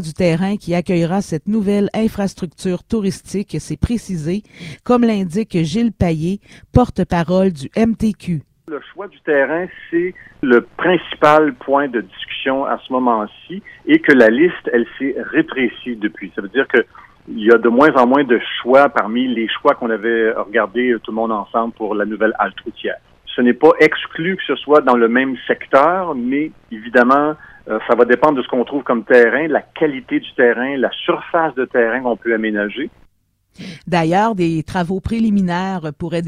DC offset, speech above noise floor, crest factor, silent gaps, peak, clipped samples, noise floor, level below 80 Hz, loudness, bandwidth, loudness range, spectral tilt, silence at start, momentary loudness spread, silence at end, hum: under 0.1%; 43 dB; 16 dB; none; 0 dBFS; under 0.1%; -59 dBFS; -42 dBFS; -16 LUFS; 12.5 kHz; 5 LU; -6.5 dB/octave; 0 s; 13 LU; 0 s; none